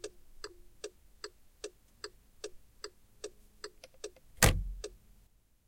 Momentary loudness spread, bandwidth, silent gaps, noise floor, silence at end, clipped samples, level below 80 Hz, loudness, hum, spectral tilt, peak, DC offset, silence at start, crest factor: 22 LU; 16.5 kHz; none; -65 dBFS; 0.75 s; under 0.1%; -46 dBFS; -30 LUFS; none; -3 dB/octave; -6 dBFS; under 0.1%; 0.05 s; 34 dB